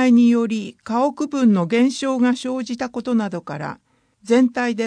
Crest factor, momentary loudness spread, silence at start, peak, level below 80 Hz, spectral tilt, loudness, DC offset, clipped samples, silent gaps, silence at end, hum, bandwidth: 14 dB; 11 LU; 0 s; -4 dBFS; -66 dBFS; -6 dB/octave; -19 LUFS; under 0.1%; under 0.1%; none; 0 s; none; 10 kHz